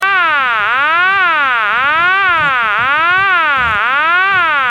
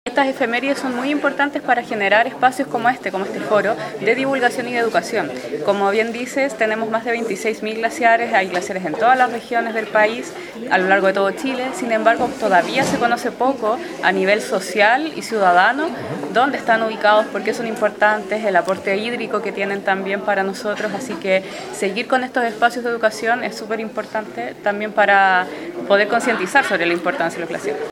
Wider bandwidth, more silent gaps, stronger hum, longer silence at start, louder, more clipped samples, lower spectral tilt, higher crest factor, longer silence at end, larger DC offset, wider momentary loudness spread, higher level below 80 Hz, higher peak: about the same, 15.5 kHz vs 16.5 kHz; neither; neither; about the same, 0 s vs 0.05 s; first, -10 LUFS vs -18 LUFS; neither; about the same, -3 dB/octave vs -4 dB/octave; second, 10 dB vs 18 dB; about the same, 0 s vs 0 s; neither; second, 2 LU vs 8 LU; first, -46 dBFS vs -62 dBFS; about the same, -2 dBFS vs 0 dBFS